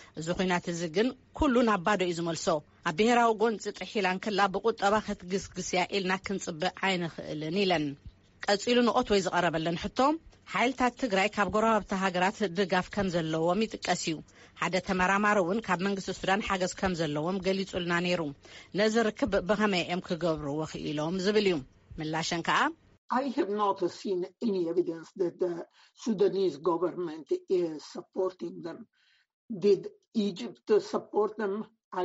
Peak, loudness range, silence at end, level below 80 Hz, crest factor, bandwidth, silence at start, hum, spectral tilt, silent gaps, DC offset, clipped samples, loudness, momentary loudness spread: -14 dBFS; 4 LU; 0 s; -56 dBFS; 16 dB; 8 kHz; 0 s; none; -3.5 dB/octave; 22.98-23.09 s, 29.33-29.48 s, 30.08-30.12 s, 31.84-31.91 s; under 0.1%; under 0.1%; -29 LUFS; 9 LU